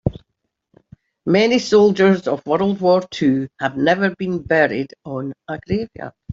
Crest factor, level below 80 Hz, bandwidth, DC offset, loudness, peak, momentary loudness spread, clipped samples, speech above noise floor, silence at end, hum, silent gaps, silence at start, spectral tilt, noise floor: 16 dB; -50 dBFS; 7.8 kHz; under 0.1%; -18 LUFS; -2 dBFS; 14 LU; under 0.1%; 58 dB; 0 s; none; none; 0.05 s; -6 dB/octave; -75 dBFS